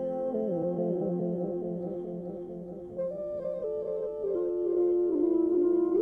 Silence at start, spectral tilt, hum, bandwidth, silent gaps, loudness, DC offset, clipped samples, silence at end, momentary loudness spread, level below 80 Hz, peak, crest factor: 0 s; -12 dB/octave; none; 2.2 kHz; none; -30 LUFS; under 0.1%; under 0.1%; 0 s; 12 LU; -62 dBFS; -16 dBFS; 12 dB